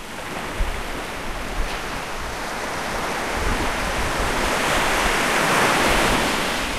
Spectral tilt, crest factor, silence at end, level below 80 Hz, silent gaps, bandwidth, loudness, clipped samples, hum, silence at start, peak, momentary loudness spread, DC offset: -3 dB/octave; 18 dB; 0 s; -32 dBFS; none; 16 kHz; -22 LUFS; under 0.1%; none; 0 s; -4 dBFS; 11 LU; 0.9%